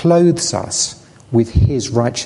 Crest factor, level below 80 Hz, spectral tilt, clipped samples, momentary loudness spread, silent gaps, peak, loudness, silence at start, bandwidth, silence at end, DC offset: 14 dB; -28 dBFS; -5 dB/octave; under 0.1%; 6 LU; none; -2 dBFS; -16 LUFS; 0 s; 11.5 kHz; 0 s; under 0.1%